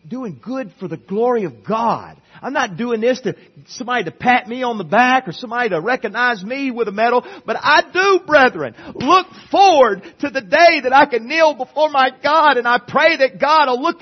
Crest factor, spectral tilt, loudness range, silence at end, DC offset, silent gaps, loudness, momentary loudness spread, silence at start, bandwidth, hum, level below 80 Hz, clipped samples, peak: 16 dB; -4 dB/octave; 7 LU; 0.1 s; under 0.1%; none; -15 LUFS; 14 LU; 0.05 s; 6.4 kHz; none; -60 dBFS; under 0.1%; 0 dBFS